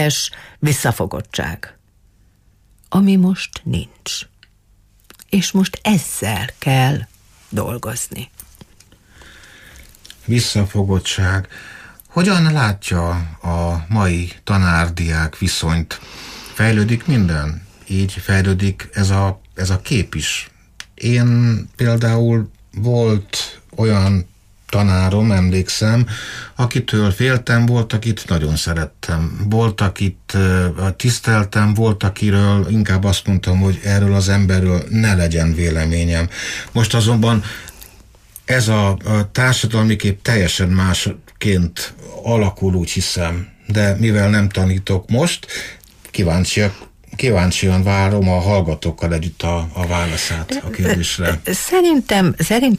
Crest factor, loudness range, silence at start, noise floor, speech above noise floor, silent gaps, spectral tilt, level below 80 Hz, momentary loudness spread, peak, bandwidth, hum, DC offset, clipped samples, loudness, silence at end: 12 dB; 5 LU; 0 s; -53 dBFS; 37 dB; none; -5.5 dB/octave; -34 dBFS; 10 LU; -4 dBFS; 15.5 kHz; none; under 0.1%; under 0.1%; -17 LUFS; 0 s